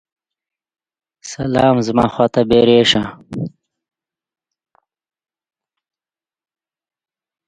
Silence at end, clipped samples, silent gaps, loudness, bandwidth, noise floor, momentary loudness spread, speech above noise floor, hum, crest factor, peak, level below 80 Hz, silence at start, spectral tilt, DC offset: 4 s; under 0.1%; none; -14 LUFS; 9.4 kHz; under -90 dBFS; 17 LU; over 76 dB; none; 20 dB; 0 dBFS; -48 dBFS; 1.25 s; -5.5 dB/octave; under 0.1%